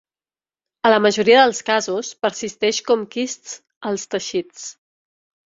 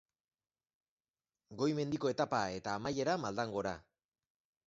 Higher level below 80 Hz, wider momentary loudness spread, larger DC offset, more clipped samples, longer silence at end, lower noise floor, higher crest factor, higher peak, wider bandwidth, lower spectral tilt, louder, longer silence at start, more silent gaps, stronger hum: about the same, -66 dBFS vs -68 dBFS; first, 18 LU vs 6 LU; neither; neither; about the same, 0.85 s vs 0.85 s; about the same, under -90 dBFS vs under -90 dBFS; about the same, 20 dB vs 20 dB; first, -2 dBFS vs -18 dBFS; about the same, 7.8 kHz vs 7.6 kHz; second, -2.5 dB/octave vs -4.5 dB/octave; first, -19 LUFS vs -37 LUFS; second, 0.85 s vs 1.5 s; first, 3.76-3.81 s vs none; neither